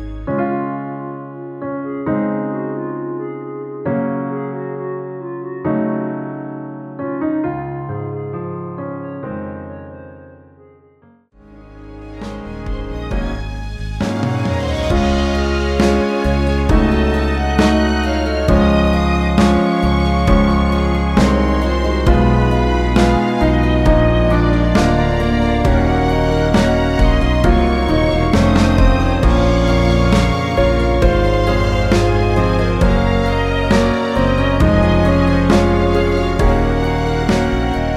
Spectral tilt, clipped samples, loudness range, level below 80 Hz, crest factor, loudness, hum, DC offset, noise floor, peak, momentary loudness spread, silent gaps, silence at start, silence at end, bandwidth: -7 dB/octave; under 0.1%; 13 LU; -20 dBFS; 14 dB; -16 LUFS; none; under 0.1%; -50 dBFS; 0 dBFS; 13 LU; none; 0 s; 0 s; 12.5 kHz